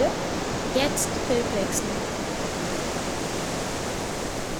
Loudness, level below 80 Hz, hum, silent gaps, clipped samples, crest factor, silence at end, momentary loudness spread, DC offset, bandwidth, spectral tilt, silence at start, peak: -27 LUFS; -42 dBFS; none; none; under 0.1%; 16 dB; 0 s; 5 LU; under 0.1%; over 20 kHz; -3.5 dB/octave; 0 s; -10 dBFS